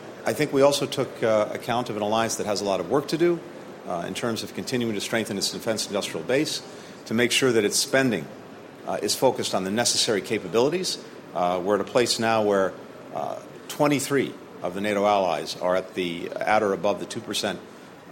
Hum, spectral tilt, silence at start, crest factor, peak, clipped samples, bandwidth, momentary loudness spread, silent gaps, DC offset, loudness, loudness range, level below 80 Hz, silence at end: none; -3.5 dB/octave; 0 s; 20 dB; -6 dBFS; under 0.1%; 16.5 kHz; 13 LU; none; under 0.1%; -24 LUFS; 3 LU; -66 dBFS; 0 s